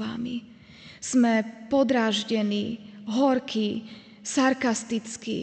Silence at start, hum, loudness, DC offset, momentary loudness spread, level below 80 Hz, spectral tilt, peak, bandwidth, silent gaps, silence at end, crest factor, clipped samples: 0 s; none; -26 LUFS; under 0.1%; 14 LU; -66 dBFS; -4 dB/octave; -10 dBFS; 9.2 kHz; none; 0 s; 16 dB; under 0.1%